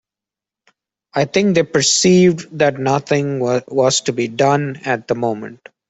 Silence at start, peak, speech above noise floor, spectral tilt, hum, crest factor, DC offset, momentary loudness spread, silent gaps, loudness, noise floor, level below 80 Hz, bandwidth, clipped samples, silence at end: 1.15 s; -2 dBFS; 72 dB; -4 dB/octave; none; 14 dB; under 0.1%; 9 LU; none; -16 LUFS; -88 dBFS; -56 dBFS; 8.4 kHz; under 0.1%; 0.35 s